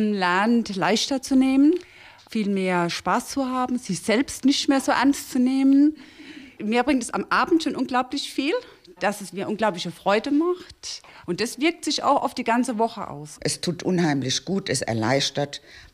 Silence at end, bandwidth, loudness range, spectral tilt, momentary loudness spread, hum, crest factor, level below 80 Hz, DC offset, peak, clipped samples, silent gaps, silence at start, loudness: 0.1 s; 15 kHz; 4 LU; -4.5 dB/octave; 11 LU; none; 14 dB; -58 dBFS; under 0.1%; -8 dBFS; under 0.1%; none; 0 s; -23 LUFS